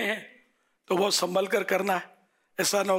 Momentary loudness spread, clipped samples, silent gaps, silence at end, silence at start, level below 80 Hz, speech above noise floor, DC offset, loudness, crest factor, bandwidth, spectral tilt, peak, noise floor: 11 LU; under 0.1%; none; 0 s; 0 s; -78 dBFS; 41 dB; under 0.1%; -27 LUFS; 14 dB; 16 kHz; -2.5 dB/octave; -14 dBFS; -67 dBFS